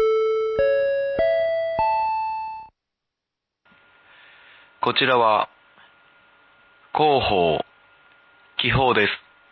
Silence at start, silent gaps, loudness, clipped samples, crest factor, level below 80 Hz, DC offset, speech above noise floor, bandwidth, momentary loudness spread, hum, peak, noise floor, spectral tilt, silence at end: 0 s; none; -21 LUFS; under 0.1%; 18 dB; -48 dBFS; under 0.1%; 65 dB; 6 kHz; 13 LU; none; -6 dBFS; -84 dBFS; -7 dB/octave; 0.35 s